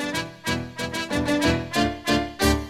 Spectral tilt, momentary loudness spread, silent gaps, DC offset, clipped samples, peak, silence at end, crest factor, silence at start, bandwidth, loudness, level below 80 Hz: -4.5 dB/octave; 7 LU; none; under 0.1%; under 0.1%; -4 dBFS; 0 s; 20 dB; 0 s; 16.5 kHz; -24 LUFS; -36 dBFS